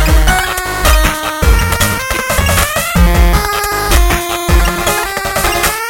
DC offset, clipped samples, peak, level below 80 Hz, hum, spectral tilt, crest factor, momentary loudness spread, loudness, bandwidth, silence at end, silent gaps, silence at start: under 0.1%; under 0.1%; 0 dBFS; -14 dBFS; none; -3.5 dB/octave; 12 dB; 4 LU; -12 LUFS; 17.5 kHz; 0 s; none; 0 s